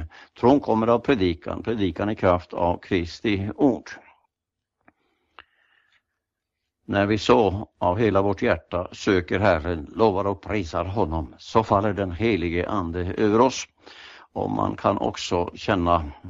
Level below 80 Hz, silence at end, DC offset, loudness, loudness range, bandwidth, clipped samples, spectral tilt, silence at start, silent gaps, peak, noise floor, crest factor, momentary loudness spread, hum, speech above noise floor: -44 dBFS; 0 s; under 0.1%; -23 LUFS; 6 LU; 7.8 kHz; under 0.1%; -6.5 dB/octave; 0 s; none; -2 dBFS; -85 dBFS; 20 dB; 10 LU; none; 62 dB